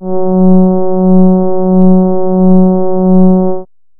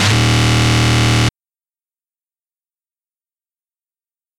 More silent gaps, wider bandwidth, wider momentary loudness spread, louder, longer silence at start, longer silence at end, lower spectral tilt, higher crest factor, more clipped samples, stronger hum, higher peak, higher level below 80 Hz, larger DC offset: neither; second, 1.6 kHz vs 13.5 kHz; about the same, 4 LU vs 3 LU; first, -9 LUFS vs -13 LUFS; about the same, 0 s vs 0 s; second, 0.35 s vs 3.1 s; first, -16 dB/octave vs -4.5 dB/octave; second, 6 dB vs 16 dB; first, 0.5% vs under 0.1%; neither; about the same, 0 dBFS vs -2 dBFS; second, -38 dBFS vs -32 dBFS; neither